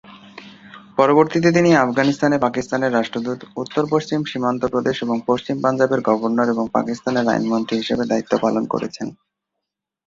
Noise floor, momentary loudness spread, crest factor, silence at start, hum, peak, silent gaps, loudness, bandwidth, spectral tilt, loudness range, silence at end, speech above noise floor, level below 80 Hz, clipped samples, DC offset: -82 dBFS; 10 LU; 18 dB; 0.1 s; none; -2 dBFS; none; -19 LUFS; 7.8 kHz; -6 dB/octave; 4 LU; 0.95 s; 63 dB; -58 dBFS; under 0.1%; under 0.1%